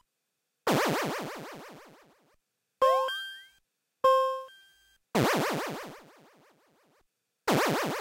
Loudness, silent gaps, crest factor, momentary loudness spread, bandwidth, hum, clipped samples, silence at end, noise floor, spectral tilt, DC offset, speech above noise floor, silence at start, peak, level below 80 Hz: -29 LUFS; none; 20 dB; 20 LU; 16 kHz; none; under 0.1%; 0 s; -82 dBFS; -4.5 dB/octave; under 0.1%; 49 dB; 0.65 s; -12 dBFS; -68 dBFS